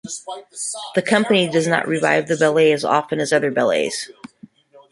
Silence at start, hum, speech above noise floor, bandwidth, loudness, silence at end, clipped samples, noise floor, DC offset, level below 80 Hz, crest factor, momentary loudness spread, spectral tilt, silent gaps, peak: 0.05 s; none; 28 dB; 11.5 kHz; -18 LUFS; 0.15 s; under 0.1%; -46 dBFS; under 0.1%; -64 dBFS; 18 dB; 12 LU; -4 dB/octave; none; -2 dBFS